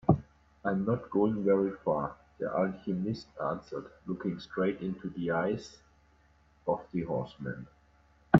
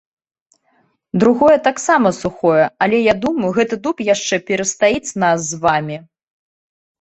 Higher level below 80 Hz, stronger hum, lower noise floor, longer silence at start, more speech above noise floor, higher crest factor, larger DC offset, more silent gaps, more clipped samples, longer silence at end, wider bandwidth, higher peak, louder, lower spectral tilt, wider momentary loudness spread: about the same, -58 dBFS vs -54 dBFS; neither; about the same, -64 dBFS vs -61 dBFS; second, 0.1 s vs 1.15 s; second, 32 dB vs 46 dB; first, 28 dB vs 16 dB; neither; neither; neither; second, 0 s vs 1 s; second, 7.6 kHz vs 8.4 kHz; about the same, -4 dBFS vs -2 dBFS; second, -33 LUFS vs -16 LUFS; first, -8.5 dB/octave vs -4.5 dB/octave; first, 12 LU vs 7 LU